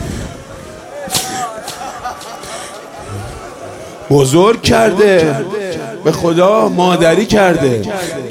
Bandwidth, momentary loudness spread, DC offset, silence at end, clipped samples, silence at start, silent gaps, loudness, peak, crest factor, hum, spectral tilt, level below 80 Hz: 16.5 kHz; 19 LU; under 0.1%; 0 s; under 0.1%; 0 s; none; -12 LUFS; 0 dBFS; 14 dB; none; -5 dB/octave; -38 dBFS